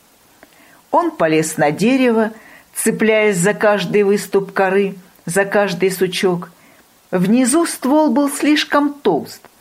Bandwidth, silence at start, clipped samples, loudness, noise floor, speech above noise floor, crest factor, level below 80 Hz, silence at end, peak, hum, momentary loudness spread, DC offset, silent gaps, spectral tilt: 16 kHz; 0.9 s; under 0.1%; -16 LUFS; -49 dBFS; 34 dB; 14 dB; -62 dBFS; 0.25 s; -2 dBFS; none; 8 LU; under 0.1%; none; -4.5 dB/octave